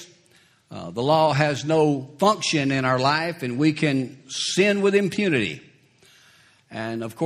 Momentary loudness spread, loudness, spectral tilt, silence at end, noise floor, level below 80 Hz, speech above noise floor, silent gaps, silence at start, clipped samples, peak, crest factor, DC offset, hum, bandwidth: 13 LU; -22 LUFS; -5 dB/octave; 0 s; -58 dBFS; -62 dBFS; 36 dB; none; 0 s; under 0.1%; -2 dBFS; 20 dB; under 0.1%; none; 14 kHz